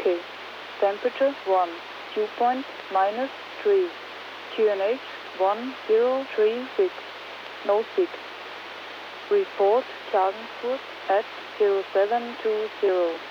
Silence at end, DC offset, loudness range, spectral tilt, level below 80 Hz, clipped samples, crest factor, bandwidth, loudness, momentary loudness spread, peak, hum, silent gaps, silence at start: 0 s; under 0.1%; 2 LU; -4.5 dB/octave; under -90 dBFS; under 0.1%; 16 dB; 7.2 kHz; -25 LUFS; 14 LU; -10 dBFS; none; none; 0 s